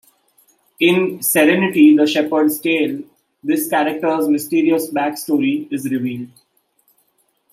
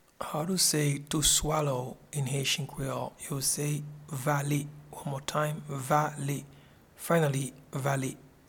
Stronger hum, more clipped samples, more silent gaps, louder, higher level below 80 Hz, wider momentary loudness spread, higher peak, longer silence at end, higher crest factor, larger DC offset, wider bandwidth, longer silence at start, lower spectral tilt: neither; neither; neither; first, -16 LUFS vs -30 LUFS; second, -68 dBFS vs -52 dBFS; about the same, 11 LU vs 12 LU; first, -2 dBFS vs -12 dBFS; first, 1.25 s vs 0.2 s; about the same, 16 dB vs 20 dB; neither; second, 16 kHz vs 18.5 kHz; first, 0.8 s vs 0.2 s; about the same, -4.5 dB/octave vs -3.5 dB/octave